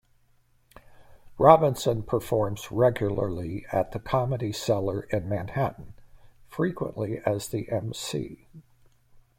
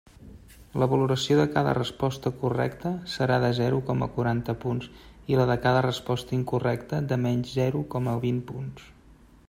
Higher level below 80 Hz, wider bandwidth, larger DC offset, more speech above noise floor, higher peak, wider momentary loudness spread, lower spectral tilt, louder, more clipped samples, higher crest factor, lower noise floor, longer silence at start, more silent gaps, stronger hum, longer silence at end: about the same, -52 dBFS vs -52 dBFS; about the same, 16.5 kHz vs 15.5 kHz; neither; first, 37 dB vs 28 dB; first, -2 dBFS vs -6 dBFS; first, 12 LU vs 9 LU; about the same, -6.5 dB/octave vs -7 dB/octave; about the same, -26 LUFS vs -26 LUFS; neither; first, 26 dB vs 20 dB; first, -63 dBFS vs -54 dBFS; first, 0.9 s vs 0.2 s; neither; neither; first, 0.8 s vs 0.6 s